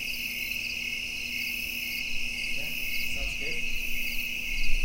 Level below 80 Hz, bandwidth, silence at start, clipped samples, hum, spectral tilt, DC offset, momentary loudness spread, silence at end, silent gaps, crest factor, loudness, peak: -36 dBFS; 16 kHz; 0 s; under 0.1%; none; -1 dB/octave; under 0.1%; 1 LU; 0 s; none; 18 dB; -30 LUFS; -10 dBFS